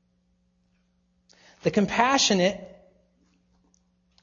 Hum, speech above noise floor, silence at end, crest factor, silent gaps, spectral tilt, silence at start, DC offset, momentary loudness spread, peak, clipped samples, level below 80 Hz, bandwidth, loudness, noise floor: none; 46 dB; 1.55 s; 22 dB; none; -3.5 dB/octave; 1.65 s; under 0.1%; 10 LU; -6 dBFS; under 0.1%; -60 dBFS; 7.6 kHz; -23 LUFS; -69 dBFS